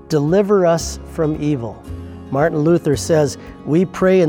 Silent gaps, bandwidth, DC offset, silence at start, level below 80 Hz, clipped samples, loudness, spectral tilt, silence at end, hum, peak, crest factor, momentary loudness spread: none; 17.5 kHz; under 0.1%; 0.1 s; -40 dBFS; under 0.1%; -17 LUFS; -6.5 dB/octave; 0 s; none; -2 dBFS; 14 dB; 15 LU